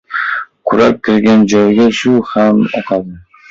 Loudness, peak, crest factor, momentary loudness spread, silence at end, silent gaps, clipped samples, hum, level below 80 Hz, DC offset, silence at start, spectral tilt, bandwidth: -11 LUFS; 0 dBFS; 10 dB; 9 LU; 0.3 s; none; under 0.1%; none; -48 dBFS; under 0.1%; 0.1 s; -6 dB/octave; 7.6 kHz